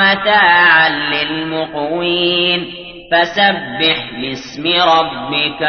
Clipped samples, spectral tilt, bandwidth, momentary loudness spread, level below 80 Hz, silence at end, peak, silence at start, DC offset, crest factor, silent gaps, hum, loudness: under 0.1%; -4.5 dB/octave; 6.6 kHz; 12 LU; -48 dBFS; 0 s; 0 dBFS; 0 s; under 0.1%; 14 dB; none; none; -13 LUFS